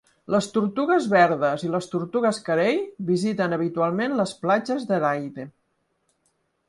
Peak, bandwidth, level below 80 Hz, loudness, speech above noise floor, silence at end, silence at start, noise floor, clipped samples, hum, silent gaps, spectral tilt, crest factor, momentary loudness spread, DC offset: -4 dBFS; 11.5 kHz; -68 dBFS; -23 LUFS; 49 dB; 1.2 s; 0.3 s; -72 dBFS; under 0.1%; none; none; -6 dB/octave; 20 dB; 8 LU; under 0.1%